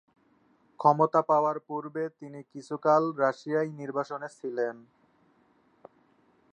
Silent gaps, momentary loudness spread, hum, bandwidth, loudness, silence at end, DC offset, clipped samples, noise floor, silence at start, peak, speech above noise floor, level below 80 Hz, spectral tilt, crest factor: none; 15 LU; none; 9.6 kHz; -28 LUFS; 1.75 s; under 0.1%; under 0.1%; -66 dBFS; 0.8 s; -6 dBFS; 38 dB; -84 dBFS; -7.5 dB/octave; 24 dB